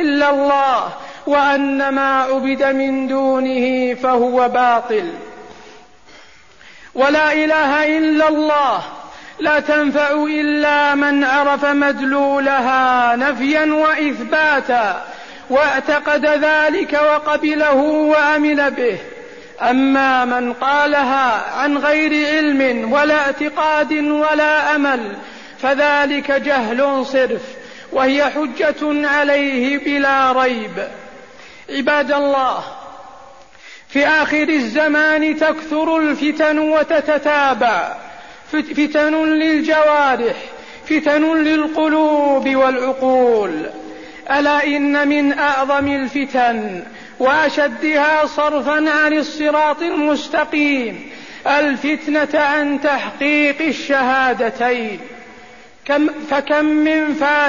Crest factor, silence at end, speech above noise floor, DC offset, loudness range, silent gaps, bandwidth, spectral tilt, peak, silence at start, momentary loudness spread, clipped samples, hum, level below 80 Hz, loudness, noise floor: 12 dB; 0 s; 29 dB; 0.5%; 3 LU; none; 7.4 kHz; -4 dB/octave; -4 dBFS; 0 s; 10 LU; under 0.1%; none; -54 dBFS; -15 LUFS; -45 dBFS